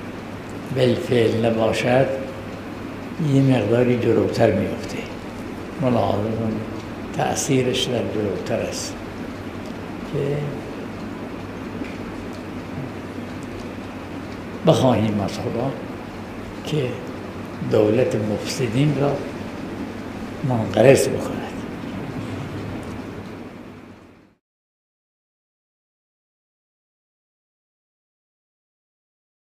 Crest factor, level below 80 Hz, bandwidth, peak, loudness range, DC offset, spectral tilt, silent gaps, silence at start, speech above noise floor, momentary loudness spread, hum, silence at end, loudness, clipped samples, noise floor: 22 dB; -48 dBFS; 15.5 kHz; 0 dBFS; 11 LU; under 0.1%; -6 dB/octave; none; 0 s; 28 dB; 15 LU; none; 5.5 s; -23 LUFS; under 0.1%; -47 dBFS